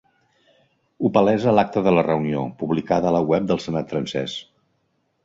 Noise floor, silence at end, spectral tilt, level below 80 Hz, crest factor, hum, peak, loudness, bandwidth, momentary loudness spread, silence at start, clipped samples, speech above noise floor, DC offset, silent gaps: -69 dBFS; 0.85 s; -7 dB/octave; -54 dBFS; 20 dB; none; -2 dBFS; -21 LUFS; 7.8 kHz; 8 LU; 1 s; under 0.1%; 49 dB; under 0.1%; none